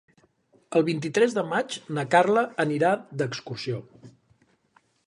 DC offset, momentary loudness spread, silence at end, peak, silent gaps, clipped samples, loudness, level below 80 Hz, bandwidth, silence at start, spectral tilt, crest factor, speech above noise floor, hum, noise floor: under 0.1%; 11 LU; 0.95 s; -6 dBFS; none; under 0.1%; -25 LUFS; -72 dBFS; 11.5 kHz; 0.7 s; -5.5 dB/octave; 20 dB; 40 dB; none; -65 dBFS